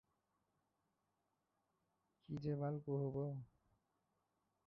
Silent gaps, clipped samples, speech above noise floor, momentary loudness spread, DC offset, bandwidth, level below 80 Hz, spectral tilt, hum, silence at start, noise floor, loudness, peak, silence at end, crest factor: none; under 0.1%; 44 dB; 10 LU; under 0.1%; 5.2 kHz; -78 dBFS; -10 dB/octave; none; 2.3 s; -87 dBFS; -45 LUFS; -32 dBFS; 1.2 s; 18 dB